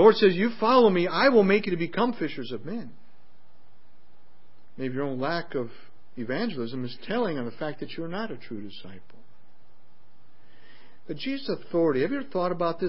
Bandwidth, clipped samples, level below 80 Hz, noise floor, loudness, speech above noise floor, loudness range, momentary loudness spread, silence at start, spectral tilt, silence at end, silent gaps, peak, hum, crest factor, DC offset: 5.8 kHz; under 0.1%; -70 dBFS; -63 dBFS; -26 LUFS; 38 dB; 15 LU; 19 LU; 0 s; -10 dB/octave; 0 s; none; -6 dBFS; none; 22 dB; 2%